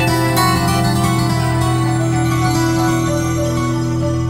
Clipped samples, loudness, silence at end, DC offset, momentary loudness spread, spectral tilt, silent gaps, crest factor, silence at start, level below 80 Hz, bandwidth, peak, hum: under 0.1%; -16 LUFS; 0 s; under 0.1%; 4 LU; -5.5 dB/octave; none; 12 dB; 0 s; -32 dBFS; 16.5 kHz; -2 dBFS; none